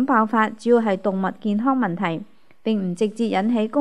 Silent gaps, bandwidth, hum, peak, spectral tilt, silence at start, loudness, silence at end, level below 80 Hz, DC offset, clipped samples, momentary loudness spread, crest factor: none; 10.5 kHz; none; -4 dBFS; -7 dB/octave; 0 s; -21 LUFS; 0 s; -72 dBFS; 0.5%; under 0.1%; 7 LU; 18 dB